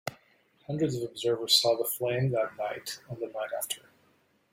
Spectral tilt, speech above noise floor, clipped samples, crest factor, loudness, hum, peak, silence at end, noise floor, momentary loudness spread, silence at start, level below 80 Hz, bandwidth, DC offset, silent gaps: -4 dB/octave; 38 dB; under 0.1%; 22 dB; -29 LUFS; none; -10 dBFS; 0.75 s; -68 dBFS; 15 LU; 0.05 s; -70 dBFS; 16.5 kHz; under 0.1%; none